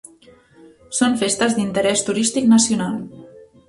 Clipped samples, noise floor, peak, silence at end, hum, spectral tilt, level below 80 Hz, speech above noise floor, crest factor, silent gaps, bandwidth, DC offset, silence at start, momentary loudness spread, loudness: under 0.1%; -49 dBFS; -4 dBFS; 0.25 s; none; -3.5 dB/octave; -56 dBFS; 32 dB; 16 dB; none; 11.5 kHz; under 0.1%; 0.9 s; 12 LU; -18 LUFS